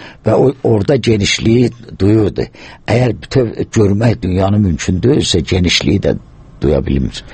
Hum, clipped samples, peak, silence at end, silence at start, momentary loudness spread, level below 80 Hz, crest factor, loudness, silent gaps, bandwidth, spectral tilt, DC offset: none; under 0.1%; 0 dBFS; 0 s; 0 s; 6 LU; -30 dBFS; 12 dB; -13 LUFS; none; 8.8 kHz; -6 dB/octave; under 0.1%